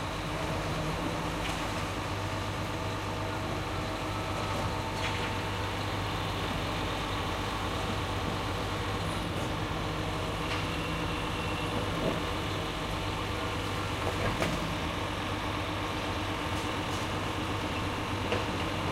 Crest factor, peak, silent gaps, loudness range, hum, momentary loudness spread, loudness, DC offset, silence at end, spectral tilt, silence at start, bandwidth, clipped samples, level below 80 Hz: 18 dB; -16 dBFS; none; 1 LU; none; 3 LU; -33 LUFS; under 0.1%; 0 s; -5 dB/octave; 0 s; 16 kHz; under 0.1%; -44 dBFS